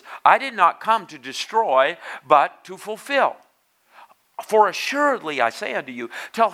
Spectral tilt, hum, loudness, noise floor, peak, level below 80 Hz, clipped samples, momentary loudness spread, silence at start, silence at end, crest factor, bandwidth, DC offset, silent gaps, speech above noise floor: -2.5 dB/octave; none; -20 LUFS; -60 dBFS; 0 dBFS; -84 dBFS; under 0.1%; 15 LU; 0.05 s; 0 s; 22 dB; 15.5 kHz; under 0.1%; none; 40 dB